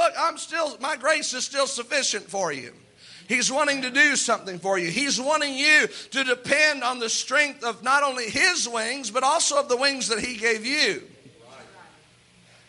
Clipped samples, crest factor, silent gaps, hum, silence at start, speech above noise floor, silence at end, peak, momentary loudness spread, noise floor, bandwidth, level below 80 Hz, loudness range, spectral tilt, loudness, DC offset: under 0.1%; 20 dB; none; none; 0 s; 32 dB; 0.85 s; -6 dBFS; 8 LU; -56 dBFS; 11.5 kHz; -66 dBFS; 4 LU; -1 dB/octave; -22 LUFS; under 0.1%